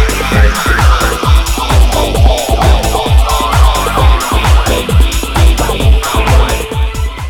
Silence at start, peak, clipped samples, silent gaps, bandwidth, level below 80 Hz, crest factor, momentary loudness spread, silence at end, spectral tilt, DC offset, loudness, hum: 0 s; 0 dBFS; 0.4%; none; 18 kHz; -10 dBFS; 8 dB; 2 LU; 0 s; -4.5 dB/octave; under 0.1%; -10 LUFS; none